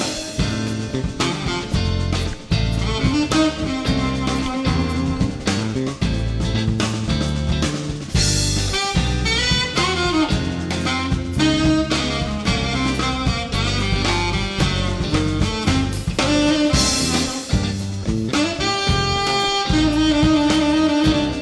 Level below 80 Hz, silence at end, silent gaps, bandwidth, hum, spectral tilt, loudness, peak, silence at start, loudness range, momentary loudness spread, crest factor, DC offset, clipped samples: -28 dBFS; 0 s; none; 11 kHz; none; -4.5 dB/octave; -19 LUFS; -8 dBFS; 0 s; 3 LU; 6 LU; 12 dB; under 0.1%; under 0.1%